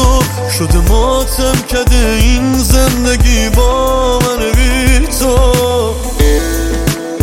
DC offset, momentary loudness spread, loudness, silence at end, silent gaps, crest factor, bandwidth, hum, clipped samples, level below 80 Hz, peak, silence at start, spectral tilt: under 0.1%; 4 LU; -12 LUFS; 0 s; none; 10 dB; 16.5 kHz; none; under 0.1%; -12 dBFS; 0 dBFS; 0 s; -4.5 dB/octave